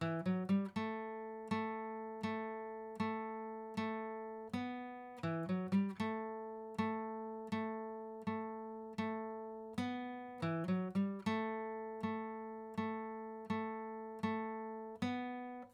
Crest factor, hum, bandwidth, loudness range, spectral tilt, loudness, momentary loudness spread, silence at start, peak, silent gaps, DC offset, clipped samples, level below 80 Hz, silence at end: 16 dB; none; 11 kHz; 2 LU; -7.5 dB/octave; -42 LUFS; 9 LU; 0 s; -24 dBFS; none; under 0.1%; under 0.1%; -82 dBFS; 0 s